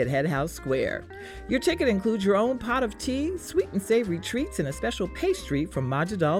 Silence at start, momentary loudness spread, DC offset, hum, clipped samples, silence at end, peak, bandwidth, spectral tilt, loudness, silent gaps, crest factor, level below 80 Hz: 0 s; 6 LU; under 0.1%; none; under 0.1%; 0 s; -12 dBFS; 17.5 kHz; -5.5 dB/octave; -27 LUFS; none; 14 dB; -44 dBFS